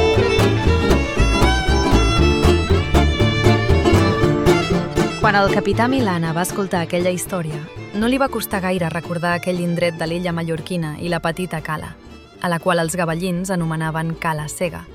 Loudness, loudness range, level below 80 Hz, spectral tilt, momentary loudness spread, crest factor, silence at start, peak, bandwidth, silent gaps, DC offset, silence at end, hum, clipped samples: -18 LUFS; 7 LU; -26 dBFS; -5.5 dB/octave; 9 LU; 18 dB; 0 s; 0 dBFS; 16.5 kHz; none; under 0.1%; 0 s; none; under 0.1%